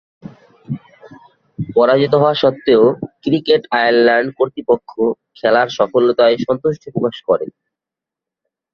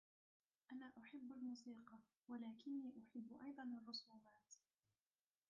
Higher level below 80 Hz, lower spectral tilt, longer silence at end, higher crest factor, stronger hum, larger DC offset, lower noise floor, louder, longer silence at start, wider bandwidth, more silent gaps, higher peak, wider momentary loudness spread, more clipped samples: first, -56 dBFS vs under -90 dBFS; first, -7 dB/octave vs -3 dB/octave; first, 1.25 s vs 0.9 s; about the same, 14 dB vs 16 dB; neither; neither; second, -86 dBFS vs under -90 dBFS; first, -15 LUFS vs -55 LUFS; about the same, 0.7 s vs 0.7 s; about the same, 6.4 kHz vs 7 kHz; neither; first, -2 dBFS vs -42 dBFS; second, 10 LU vs 16 LU; neither